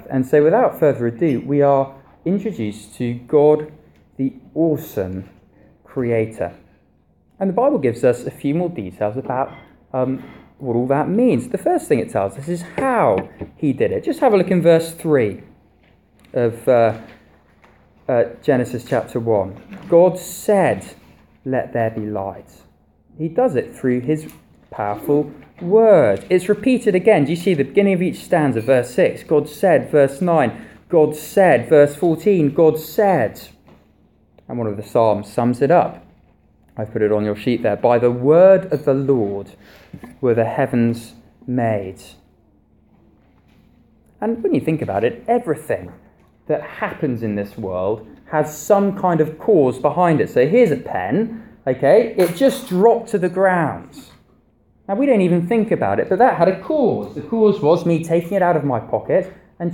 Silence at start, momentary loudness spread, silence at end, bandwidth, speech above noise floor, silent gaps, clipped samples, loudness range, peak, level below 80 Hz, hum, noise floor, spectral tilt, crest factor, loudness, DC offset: 0.05 s; 12 LU; 0 s; 17 kHz; 40 dB; none; under 0.1%; 7 LU; -2 dBFS; -54 dBFS; none; -57 dBFS; -7.5 dB/octave; 16 dB; -18 LUFS; under 0.1%